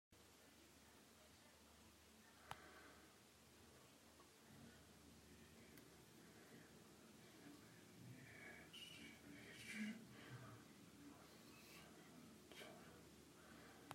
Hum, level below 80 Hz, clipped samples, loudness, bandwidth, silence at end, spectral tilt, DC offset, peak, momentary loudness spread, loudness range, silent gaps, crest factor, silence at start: none; -84 dBFS; under 0.1%; -62 LUFS; 16 kHz; 0 s; -3.5 dB/octave; under 0.1%; -32 dBFS; 9 LU; 8 LU; none; 30 dB; 0.1 s